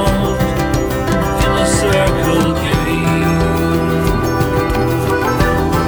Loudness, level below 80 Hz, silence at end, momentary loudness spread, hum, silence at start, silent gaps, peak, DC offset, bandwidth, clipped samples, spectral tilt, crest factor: -15 LUFS; -24 dBFS; 0 s; 3 LU; none; 0 s; none; 0 dBFS; under 0.1%; over 20 kHz; under 0.1%; -5.5 dB/octave; 14 dB